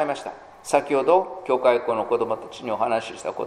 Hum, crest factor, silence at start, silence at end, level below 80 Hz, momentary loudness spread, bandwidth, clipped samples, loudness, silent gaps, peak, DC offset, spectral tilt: none; 20 dB; 0 s; 0 s; -64 dBFS; 12 LU; 13.5 kHz; under 0.1%; -23 LUFS; none; -4 dBFS; under 0.1%; -4.5 dB/octave